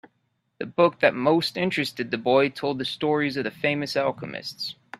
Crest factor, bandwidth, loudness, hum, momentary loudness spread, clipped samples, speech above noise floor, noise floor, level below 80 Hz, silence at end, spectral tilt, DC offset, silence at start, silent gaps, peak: 22 dB; 14 kHz; -24 LUFS; none; 12 LU; under 0.1%; 49 dB; -73 dBFS; -66 dBFS; 0.05 s; -5.5 dB/octave; under 0.1%; 0.6 s; none; -2 dBFS